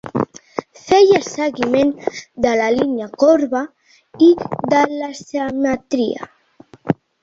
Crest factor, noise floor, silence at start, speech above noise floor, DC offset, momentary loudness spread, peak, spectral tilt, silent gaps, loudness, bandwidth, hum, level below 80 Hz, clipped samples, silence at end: 16 dB; -47 dBFS; 0.05 s; 31 dB; under 0.1%; 15 LU; -2 dBFS; -5.5 dB/octave; none; -17 LUFS; 7.8 kHz; none; -52 dBFS; under 0.1%; 0.3 s